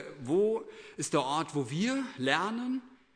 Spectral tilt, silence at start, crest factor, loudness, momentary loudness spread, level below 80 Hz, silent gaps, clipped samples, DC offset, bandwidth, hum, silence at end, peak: -4.5 dB/octave; 0 s; 22 dB; -31 LUFS; 8 LU; -72 dBFS; none; under 0.1%; under 0.1%; 11 kHz; none; 0.2 s; -10 dBFS